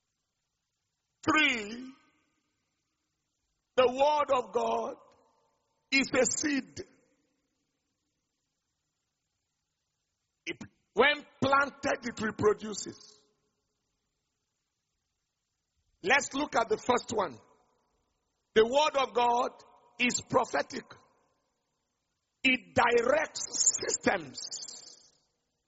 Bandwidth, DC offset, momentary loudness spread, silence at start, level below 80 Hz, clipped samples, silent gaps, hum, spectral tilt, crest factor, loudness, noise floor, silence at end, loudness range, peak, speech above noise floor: 8 kHz; under 0.1%; 15 LU; 1.25 s; -66 dBFS; under 0.1%; none; none; -1.5 dB/octave; 22 dB; -29 LUFS; -84 dBFS; 0.8 s; 7 LU; -10 dBFS; 55 dB